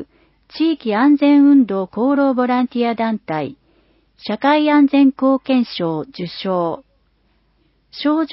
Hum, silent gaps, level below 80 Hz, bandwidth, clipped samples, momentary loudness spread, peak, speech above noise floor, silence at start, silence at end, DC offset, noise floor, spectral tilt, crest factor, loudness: none; none; -60 dBFS; 5.8 kHz; under 0.1%; 14 LU; -4 dBFS; 45 dB; 0 s; 0 s; under 0.1%; -60 dBFS; -10.5 dB/octave; 12 dB; -16 LUFS